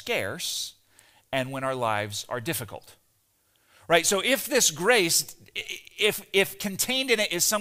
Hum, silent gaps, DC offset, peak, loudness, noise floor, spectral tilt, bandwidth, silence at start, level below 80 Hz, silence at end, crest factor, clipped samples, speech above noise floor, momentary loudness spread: none; none; under 0.1%; -4 dBFS; -25 LUFS; -68 dBFS; -2 dB/octave; 16 kHz; 0 s; -64 dBFS; 0 s; 22 dB; under 0.1%; 42 dB; 13 LU